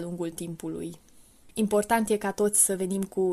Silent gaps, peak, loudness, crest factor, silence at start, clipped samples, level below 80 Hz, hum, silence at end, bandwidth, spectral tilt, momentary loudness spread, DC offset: none; -8 dBFS; -26 LUFS; 20 dB; 0 s; under 0.1%; -60 dBFS; none; 0 s; 15 kHz; -4 dB/octave; 15 LU; under 0.1%